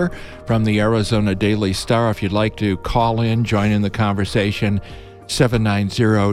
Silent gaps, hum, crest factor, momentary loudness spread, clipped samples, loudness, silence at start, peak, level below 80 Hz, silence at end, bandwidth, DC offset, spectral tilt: none; none; 16 dB; 6 LU; under 0.1%; -18 LUFS; 0 s; -2 dBFS; -36 dBFS; 0 s; 13 kHz; under 0.1%; -6.5 dB/octave